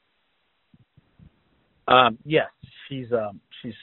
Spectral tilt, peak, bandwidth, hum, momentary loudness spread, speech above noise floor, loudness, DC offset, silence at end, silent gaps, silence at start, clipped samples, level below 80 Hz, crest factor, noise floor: -2.5 dB/octave; 0 dBFS; 4.2 kHz; none; 22 LU; 49 dB; -22 LUFS; under 0.1%; 0.1 s; none; 1.85 s; under 0.1%; -62 dBFS; 26 dB; -71 dBFS